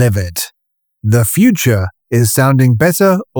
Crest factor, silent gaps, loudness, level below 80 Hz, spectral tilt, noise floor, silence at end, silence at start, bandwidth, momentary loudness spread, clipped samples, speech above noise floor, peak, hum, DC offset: 12 dB; none; -12 LUFS; -42 dBFS; -5.5 dB/octave; -70 dBFS; 0 s; 0 s; over 20 kHz; 10 LU; under 0.1%; 59 dB; -2 dBFS; none; under 0.1%